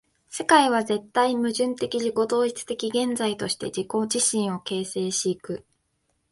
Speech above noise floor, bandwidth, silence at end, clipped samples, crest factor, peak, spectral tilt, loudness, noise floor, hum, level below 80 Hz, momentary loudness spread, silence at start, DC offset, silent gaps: 48 dB; 11.5 kHz; 0.7 s; under 0.1%; 20 dB; -4 dBFS; -3 dB/octave; -24 LUFS; -72 dBFS; none; -66 dBFS; 10 LU; 0.3 s; under 0.1%; none